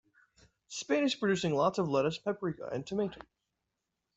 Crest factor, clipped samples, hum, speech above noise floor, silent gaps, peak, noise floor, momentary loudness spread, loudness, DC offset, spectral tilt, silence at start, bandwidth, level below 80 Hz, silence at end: 18 dB; under 0.1%; none; 54 dB; none; -16 dBFS; -86 dBFS; 11 LU; -32 LUFS; under 0.1%; -5 dB/octave; 0.7 s; 8.2 kHz; -68 dBFS; 0.95 s